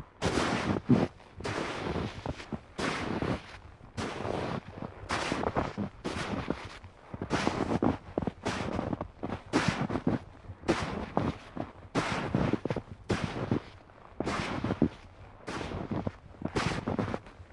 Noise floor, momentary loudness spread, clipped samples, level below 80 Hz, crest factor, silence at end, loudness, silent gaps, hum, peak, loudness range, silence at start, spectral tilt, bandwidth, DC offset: -52 dBFS; 12 LU; under 0.1%; -50 dBFS; 24 dB; 0 s; -34 LUFS; none; none; -10 dBFS; 3 LU; 0 s; -6 dB/octave; 11.5 kHz; under 0.1%